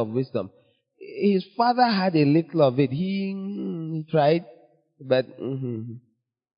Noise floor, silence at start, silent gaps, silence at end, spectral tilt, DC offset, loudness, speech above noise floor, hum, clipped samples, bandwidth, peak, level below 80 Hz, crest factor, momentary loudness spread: -47 dBFS; 0 s; none; 0.6 s; -11.5 dB/octave; under 0.1%; -24 LUFS; 24 dB; none; under 0.1%; 5.4 kHz; -6 dBFS; -70 dBFS; 18 dB; 12 LU